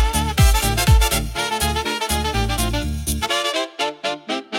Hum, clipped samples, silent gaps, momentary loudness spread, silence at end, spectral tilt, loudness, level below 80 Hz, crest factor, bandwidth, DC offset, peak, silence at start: none; under 0.1%; none; 7 LU; 0 s; -3.5 dB/octave; -20 LUFS; -24 dBFS; 16 dB; 17 kHz; under 0.1%; -4 dBFS; 0 s